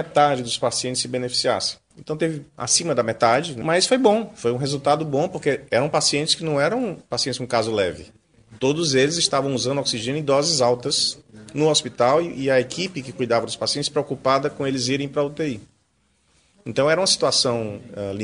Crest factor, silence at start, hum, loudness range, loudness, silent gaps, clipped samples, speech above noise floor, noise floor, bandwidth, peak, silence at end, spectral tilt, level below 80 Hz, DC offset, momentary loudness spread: 20 dB; 0 s; none; 3 LU; -21 LUFS; none; under 0.1%; 44 dB; -65 dBFS; 10.5 kHz; -2 dBFS; 0 s; -3.5 dB/octave; -58 dBFS; under 0.1%; 9 LU